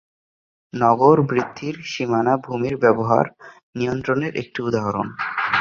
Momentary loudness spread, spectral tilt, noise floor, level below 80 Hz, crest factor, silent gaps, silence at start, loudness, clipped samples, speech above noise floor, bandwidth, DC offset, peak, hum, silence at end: 12 LU; -7 dB/octave; under -90 dBFS; -56 dBFS; 20 dB; 3.63-3.73 s; 0.75 s; -20 LUFS; under 0.1%; over 70 dB; 7.2 kHz; under 0.1%; -2 dBFS; none; 0 s